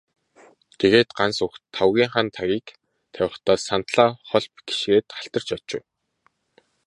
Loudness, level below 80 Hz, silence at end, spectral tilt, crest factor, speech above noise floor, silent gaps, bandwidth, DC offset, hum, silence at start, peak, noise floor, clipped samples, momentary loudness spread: -22 LUFS; -58 dBFS; 1.05 s; -4.5 dB/octave; 22 dB; 45 dB; none; 11.5 kHz; under 0.1%; none; 0.8 s; 0 dBFS; -67 dBFS; under 0.1%; 11 LU